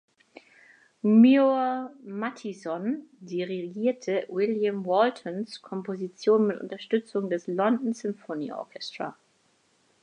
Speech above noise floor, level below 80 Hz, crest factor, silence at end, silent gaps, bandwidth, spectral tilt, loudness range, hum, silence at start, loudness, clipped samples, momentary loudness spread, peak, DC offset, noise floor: 41 dB; -84 dBFS; 18 dB; 0.9 s; none; 9.4 kHz; -6.5 dB/octave; 5 LU; none; 1.05 s; -27 LUFS; under 0.1%; 14 LU; -10 dBFS; under 0.1%; -67 dBFS